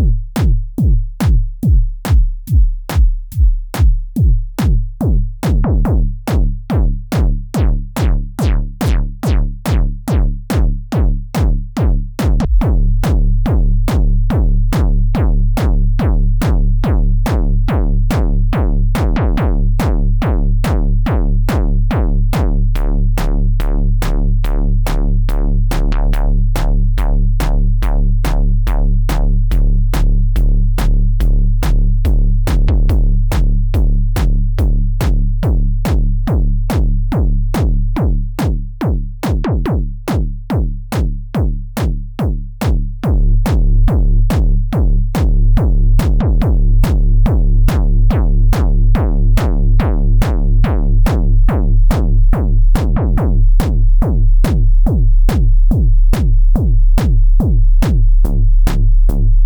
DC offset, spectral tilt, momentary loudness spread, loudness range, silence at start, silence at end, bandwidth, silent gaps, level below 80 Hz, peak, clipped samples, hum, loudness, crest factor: under 0.1%; -7.5 dB/octave; 4 LU; 3 LU; 0 s; 0 s; 12.5 kHz; none; -12 dBFS; 0 dBFS; under 0.1%; none; -16 LUFS; 12 dB